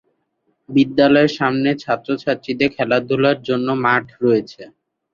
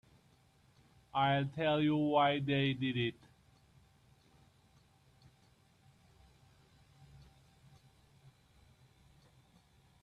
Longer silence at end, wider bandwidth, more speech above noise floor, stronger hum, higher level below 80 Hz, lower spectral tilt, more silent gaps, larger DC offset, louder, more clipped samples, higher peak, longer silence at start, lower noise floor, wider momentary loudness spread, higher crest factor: second, 0.45 s vs 6.9 s; second, 7.2 kHz vs 9.8 kHz; first, 51 dB vs 36 dB; neither; first, -58 dBFS vs -70 dBFS; about the same, -7 dB/octave vs -7.5 dB/octave; neither; neither; first, -17 LUFS vs -33 LUFS; neither; first, -2 dBFS vs -18 dBFS; second, 0.7 s vs 1.15 s; about the same, -68 dBFS vs -68 dBFS; about the same, 8 LU vs 7 LU; second, 16 dB vs 22 dB